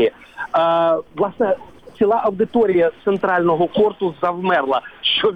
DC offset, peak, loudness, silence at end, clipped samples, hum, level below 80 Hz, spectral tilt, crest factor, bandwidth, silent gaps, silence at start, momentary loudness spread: 0.2%; -4 dBFS; -18 LUFS; 0 s; under 0.1%; none; -56 dBFS; -7 dB/octave; 12 dB; 5.6 kHz; none; 0 s; 5 LU